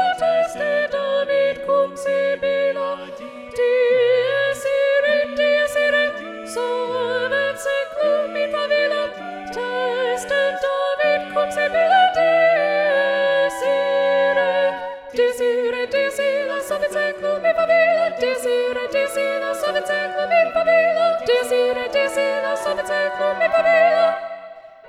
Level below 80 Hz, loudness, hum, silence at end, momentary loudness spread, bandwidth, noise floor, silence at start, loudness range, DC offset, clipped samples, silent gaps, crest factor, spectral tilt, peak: -58 dBFS; -19 LUFS; none; 0 s; 7 LU; 14 kHz; -39 dBFS; 0 s; 4 LU; under 0.1%; under 0.1%; none; 14 dB; -2.5 dB/octave; -4 dBFS